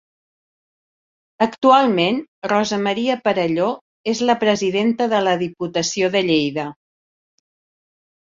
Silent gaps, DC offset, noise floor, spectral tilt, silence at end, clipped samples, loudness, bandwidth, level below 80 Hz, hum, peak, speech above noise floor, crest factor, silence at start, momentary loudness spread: 2.28-2.42 s, 3.81-4.04 s; under 0.1%; under -90 dBFS; -4.5 dB/octave; 1.6 s; under 0.1%; -19 LUFS; 7.8 kHz; -62 dBFS; none; -2 dBFS; over 72 dB; 18 dB; 1.4 s; 10 LU